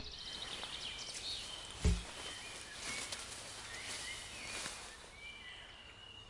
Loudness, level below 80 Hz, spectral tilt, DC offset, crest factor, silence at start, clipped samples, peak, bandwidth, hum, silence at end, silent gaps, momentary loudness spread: -43 LUFS; -50 dBFS; -2.5 dB/octave; under 0.1%; 24 dB; 0 s; under 0.1%; -20 dBFS; 11.5 kHz; none; 0 s; none; 12 LU